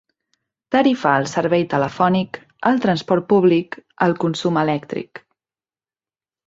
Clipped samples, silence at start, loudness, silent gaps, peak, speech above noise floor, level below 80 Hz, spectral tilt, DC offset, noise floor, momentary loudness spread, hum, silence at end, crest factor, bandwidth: under 0.1%; 0.7 s; -18 LUFS; none; -2 dBFS; over 72 dB; -60 dBFS; -6.5 dB/octave; under 0.1%; under -90 dBFS; 11 LU; none; 1.3 s; 18 dB; 7.8 kHz